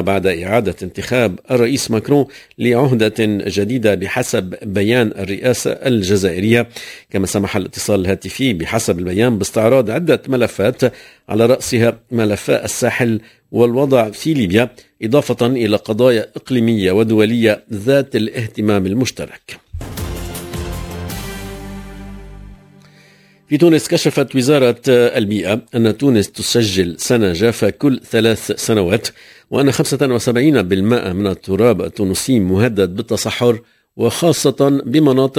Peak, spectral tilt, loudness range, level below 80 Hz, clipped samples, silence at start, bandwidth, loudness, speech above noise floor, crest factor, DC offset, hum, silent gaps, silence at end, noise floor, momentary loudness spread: 0 dBFS; -5.5 dB/octave; 5 LU; -38 dBFS; under 0.1%; 0 s; 16 kHz; -15 LUFS; 33 dB; 16 dB; under 0.1%; none; none; 0 s; -48 dBFS; 12 LU